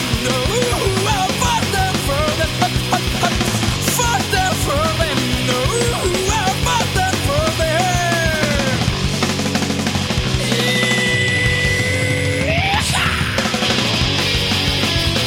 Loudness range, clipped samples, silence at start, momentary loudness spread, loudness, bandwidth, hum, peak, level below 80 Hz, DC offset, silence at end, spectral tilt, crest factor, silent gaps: 1 LU; under 0.1%; 0 s; 3 LU; -16 LUFS; 16.5 kHz; none; -2 dBFS; -30 dBFS; under 0.1%; 0 s; -3.5 dB/octave; 16 dB; none